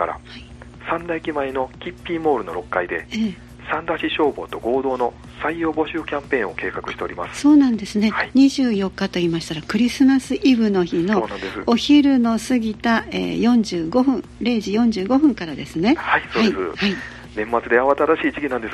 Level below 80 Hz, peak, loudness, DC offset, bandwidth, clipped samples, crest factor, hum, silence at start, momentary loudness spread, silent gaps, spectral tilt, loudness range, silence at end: -46 dBFS; -2 dBFS; -20 LUFS; under 0.1%; 12.5 kHz; under 0.1%; 18 dB; 60 Hz at -45 dBFS; 0 s; 11 LU; none; -5.5 dB/octave; 6 LU; 0 s